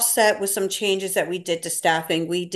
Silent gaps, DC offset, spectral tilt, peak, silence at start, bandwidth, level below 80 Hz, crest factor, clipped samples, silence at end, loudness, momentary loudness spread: none; under 0.1%; -2.5 dB/octave; -6 dBFS; 0 s; 13 kHz; -72 dBFS; 16 dB; under 0.1%; 0 s; -22 LUFS; 6 LU